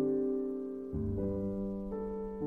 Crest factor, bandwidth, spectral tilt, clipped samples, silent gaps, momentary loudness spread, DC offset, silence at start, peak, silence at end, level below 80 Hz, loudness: 12 dB; 2.4 kHz; -12 dB/octave; under 0.1%; none; 6 LU; under 0.1%; 0 s; -22 dBFS; 0 s; -50 dBFS; -36 LUFS